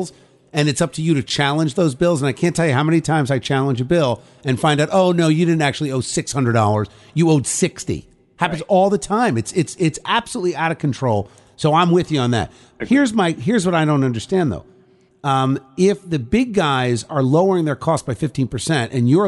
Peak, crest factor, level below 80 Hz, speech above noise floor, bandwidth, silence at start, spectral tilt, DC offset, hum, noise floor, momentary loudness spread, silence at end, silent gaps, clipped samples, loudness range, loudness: -2 dBFS; 16 dB; -48 dBFS; 35 dB; 11.5 kHz; 0 s; -5.5 dB/octave; under 0.1%; none; -53 dBFS; 7 LU; 0 s; none; under 0.1%; 2 LU; -18 LUFS